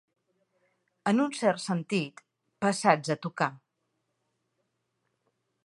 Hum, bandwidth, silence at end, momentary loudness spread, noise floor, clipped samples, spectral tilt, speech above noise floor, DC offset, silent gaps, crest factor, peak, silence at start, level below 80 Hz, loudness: none; 11.5 kHz; 2.1 s; 7 LU; -79 dBFS; under 0.1%; -5 dB/octave; 52 dB; under 0.1%; none; 26 dB; -6 dBFS; 1.05 s; -80 dBFS; -28 LUFS